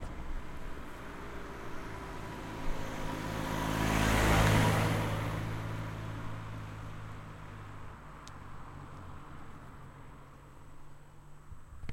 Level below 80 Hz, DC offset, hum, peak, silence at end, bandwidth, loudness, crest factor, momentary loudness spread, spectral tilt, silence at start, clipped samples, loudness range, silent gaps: -44 dBFS; under 0.1%; none; -12 dBFS; 0 s; 16.5 kHz; -34 LUFS; 22 dB; 25 LU; -5.5 dB/octave; 0 s; under 0.1%; 20 LU; none